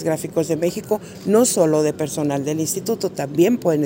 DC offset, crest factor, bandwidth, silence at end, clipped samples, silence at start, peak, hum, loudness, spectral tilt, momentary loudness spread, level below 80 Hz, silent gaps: under 0.1%; 16 dB; 16.5 kHz; 0 s; under 0.1%; 0 s; -4 dBFS; none; -20 LUFS; -5 dB/octave; 7 LU; -58 dBFS; none